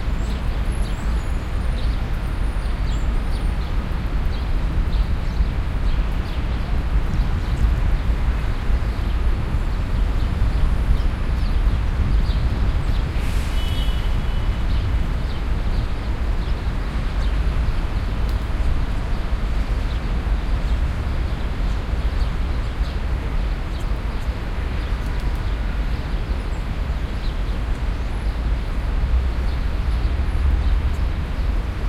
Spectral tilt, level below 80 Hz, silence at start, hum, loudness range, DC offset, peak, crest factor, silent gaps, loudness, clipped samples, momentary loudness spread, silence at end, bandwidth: -7 dB/octave; -20 dBFS; 0 s; none; 3 LU; under 0.1%; -4 dBFS; 16 dB; none; -24 LUFS; under 0.1%; 4 LU; 0 s; 11.5 kHz